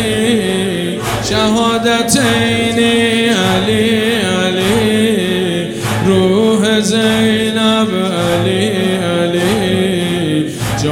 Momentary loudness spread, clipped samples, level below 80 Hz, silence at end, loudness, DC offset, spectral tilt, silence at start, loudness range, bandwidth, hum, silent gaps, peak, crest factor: 5 LU; under 0.1%; -40 dBFS; 0 s; -13 LUFS; under 0.1%; -4.5 dB/octave; 0 s; 1 LU; 17 kHz; none; none; 0 dBFS; 12 dB